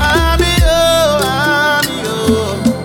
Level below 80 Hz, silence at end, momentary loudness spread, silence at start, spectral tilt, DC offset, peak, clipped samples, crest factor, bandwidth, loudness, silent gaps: -20 dBFS; 0 s; 5 LU; 0 s; -4 dB/octave; under 0.1%; -2 dBFS; under 0.1%; 12 dB; 19.5 kHz; -12 LUFS; none